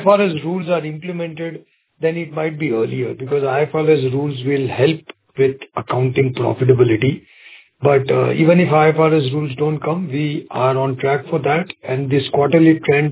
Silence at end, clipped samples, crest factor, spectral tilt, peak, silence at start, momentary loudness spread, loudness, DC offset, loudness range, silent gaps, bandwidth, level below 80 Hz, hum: 0 s; under 0.1%; 16 dB; -11.5 dB/octave; 0 dBFS; 0 s; 11 LU; -17 LUFS; under 0.1%; 5 LU; none; 4 kHz; -56 dBFS; none